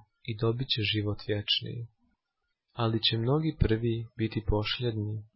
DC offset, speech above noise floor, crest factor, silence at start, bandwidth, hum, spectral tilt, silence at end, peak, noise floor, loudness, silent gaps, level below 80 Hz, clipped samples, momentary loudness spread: under 0.1%; 53 dB; 20 dB; 0.25 s; 5.8 kHz; none; -10 dB/octave; 0.1 s; -10 dBFS; -83 dBFS; -29 LUFS; none; -44 dBFS; under 0.1%; 11 LU